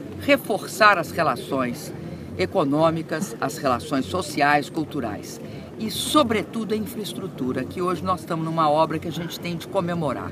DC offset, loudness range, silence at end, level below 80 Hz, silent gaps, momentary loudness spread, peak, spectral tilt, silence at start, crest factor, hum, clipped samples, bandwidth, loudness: under 0.1%; 3 LU; 0 s; -56 dBFS; none; 11 LU; 0 dBFS; -5 dB/octave; 0 s; 22 dB; none; under 0.1%; 15.5 kHz; -23 LUFS